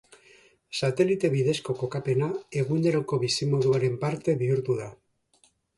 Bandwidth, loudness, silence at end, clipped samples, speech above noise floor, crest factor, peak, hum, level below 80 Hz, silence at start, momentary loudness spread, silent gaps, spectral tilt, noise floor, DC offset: 11.5 kHz; -26 LUFS; 0.85 s; under 0.1%; 40 dB; 18 dB; -10 dBFS; none; -64 dBFS; 0.7 s; 6 LU; none; -6 dB/octave; -65 dBFS; under 0.1%